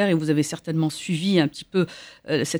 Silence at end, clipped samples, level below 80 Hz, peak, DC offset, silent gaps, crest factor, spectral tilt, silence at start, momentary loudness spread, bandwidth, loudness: 0 s; under 0.1%; -64 dBFS; -6 dBFS; under 0.1%; none; 16 dB; -5.5 dB/octave; 0 s; 6 LU; over 20 kHz; -24 LUFS